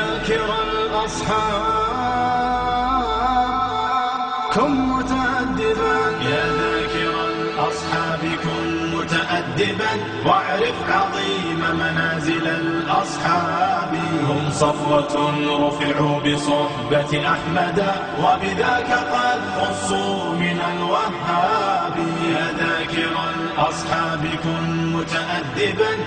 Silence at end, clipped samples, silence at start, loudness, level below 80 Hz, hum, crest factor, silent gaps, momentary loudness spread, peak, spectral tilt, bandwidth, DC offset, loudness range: 0 s; under 0.1%; 0 s; -20 LUFS; -42 dBFS; none; 18 dB; none; 3 LU; -4 dBFS; -5 dB/octave; 10 kHz; under 0.1%; 2 LU